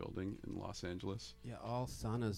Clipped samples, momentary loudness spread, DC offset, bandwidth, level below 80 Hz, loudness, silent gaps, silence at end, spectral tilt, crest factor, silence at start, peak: under 0.1%; 7 LU; under 0.1%; 15.5 kHz; -58 dBFS; -45 LUFS; none; 0 s; -6 dB/octave; 16 dB; 0 s; -26 dBFS